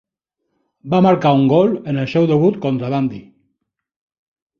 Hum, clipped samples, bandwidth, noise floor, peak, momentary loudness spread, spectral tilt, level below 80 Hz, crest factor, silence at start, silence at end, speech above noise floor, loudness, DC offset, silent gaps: none; under 0.1%; 6.8 kHz; -75 dBFS; 0 dBFS; 8 LU; -9 dB/octave; -56 dBFS; 16 dB; 0.85 s; 1.4 s; 60 dB; -16 LUFS; under 0.1%; none